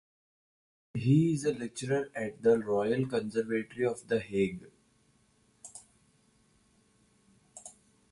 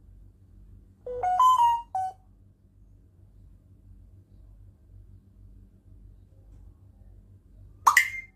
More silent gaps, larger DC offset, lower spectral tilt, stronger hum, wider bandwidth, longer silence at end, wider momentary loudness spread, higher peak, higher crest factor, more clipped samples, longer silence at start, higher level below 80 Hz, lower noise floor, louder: neither; neither; first, -7 dB/octave vs -1 dB/octave; neither; second, 11.5 kHz vs 15 kHz; first, 0.4 s vs 0.1 s; first, 23 LU vs 17 LU; second, -14 dBFS vs -4 dBFS; second, 18 dB vs 26 dB; neither; about the same, 0.95 s vs 1.05 s; second, -68 dBFS vs -54 dBFS; first, -68 dBFS vs -57 dBFS; second, -31 LUFS vs -24 LUFS